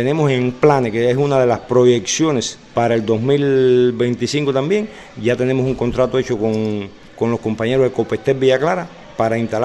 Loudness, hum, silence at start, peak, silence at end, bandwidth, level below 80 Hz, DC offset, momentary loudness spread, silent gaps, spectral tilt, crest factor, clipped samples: -17 LUFS; none; 0 s; 0 dBFS; 0 s; 11.5 kHz; -46 dBFS; under 0.1%; 7 LU; none; -5.5 dB/octave; 16 dB; under 0.1%